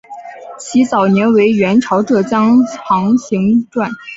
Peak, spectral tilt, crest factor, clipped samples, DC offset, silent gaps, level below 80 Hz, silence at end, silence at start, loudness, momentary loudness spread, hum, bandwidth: -2 dBFS; -6.5 dB/octave; 12 dB; under 0.1%; under 0.1%; none; -54 dBFS; 0 s; 0.1 s; -13 LUFS; 12 LU; none; 7.8 kHz